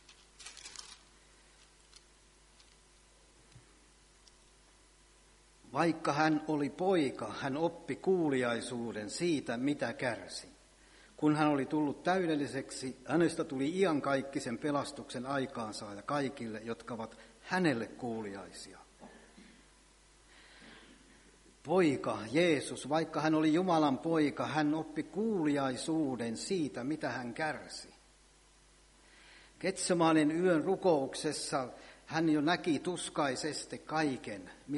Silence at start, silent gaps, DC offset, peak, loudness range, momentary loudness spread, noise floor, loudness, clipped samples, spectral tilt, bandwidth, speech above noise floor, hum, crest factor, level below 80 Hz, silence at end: 0.1 s; none; under 0.1%; -14 dBFS; 8 LU; 15 LU; -64 dBFS; -34 LUFS; under 0.1%; -5 dB/octave; 11.5 kHz; 30 dB; none; 20 dB; -68 dBFS; 0 s